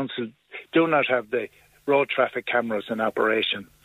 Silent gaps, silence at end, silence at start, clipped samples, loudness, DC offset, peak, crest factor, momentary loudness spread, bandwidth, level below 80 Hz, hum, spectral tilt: none; 0.2 s; 0 s; under 0.1%; -24 LUFS; under 0.1%; -8 dBFS; 18 dB; 14 LU; 15.5 kHz; -68 dBFS; none; -6 dB/octave